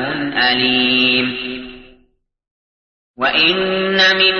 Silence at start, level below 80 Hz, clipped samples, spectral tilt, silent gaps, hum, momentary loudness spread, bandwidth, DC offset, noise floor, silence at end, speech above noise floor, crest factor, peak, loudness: 0 s; -50 dBFS; under 0.1%; -4 dB/octave; 2.51-3.14 s; none; 13 LU; 6.6 kHz; under 0.1%; -59 dBFS; 0 s; 44 dB; 16 dB; -2 dBFS; -14 LUFS